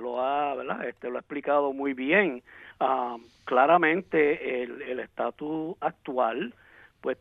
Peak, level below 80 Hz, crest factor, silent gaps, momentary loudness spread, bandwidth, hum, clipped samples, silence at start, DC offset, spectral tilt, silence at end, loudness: -6 dBFS; -68 dBFS; 22 dB; none; 13 LU; 5.2 kHz; none; under 0.1%; 0 s; under 0.1%; -7.5 dB/octave; 0.05 s; -27 LUFS